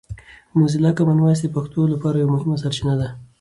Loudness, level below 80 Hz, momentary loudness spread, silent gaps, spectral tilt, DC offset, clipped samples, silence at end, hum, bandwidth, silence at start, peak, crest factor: -19 LUFS; -48 dBFS; 7 LU; none; -7.5 dB/octave; under 0.1%; under 0.1%; 0.15 s; none; 11.5 kHz; 0.1 s; -4 dBFS; 14 dB